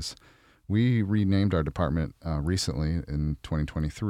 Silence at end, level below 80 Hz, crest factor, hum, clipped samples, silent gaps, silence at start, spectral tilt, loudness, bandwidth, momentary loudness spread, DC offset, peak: 0 s; -40 dBFS; 14 dB; none; under 0.1%; none; 0 s; -6.5 dB/octave; -28 LUFS; 15 kHz; 7 LU; under 0.1%; -14 dBFS